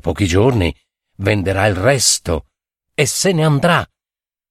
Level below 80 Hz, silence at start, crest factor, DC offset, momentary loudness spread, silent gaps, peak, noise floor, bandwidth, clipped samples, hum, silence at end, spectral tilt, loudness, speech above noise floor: -36 dBFS; 0.05 s; 16 dB; under 0.1%; 10 LU; none; 0 dBFS; under -90 dBFS; 16 kHz; under 0.1%; none; 0.65 s; -4 dB/octave; -15 LUFS; over 75 dB